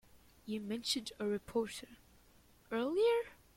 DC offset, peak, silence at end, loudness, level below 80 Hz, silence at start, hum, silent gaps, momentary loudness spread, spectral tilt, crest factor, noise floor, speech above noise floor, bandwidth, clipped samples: under 0.1%; -22 dBFS; 0.2 s; -37 LUFS; -68 dBFS; 0.15 s; none; none; 14 LU; -3.5 dB/octave; 16 dB; -65 dBFS; 29 dB; 16.5 kHz; under 0.1%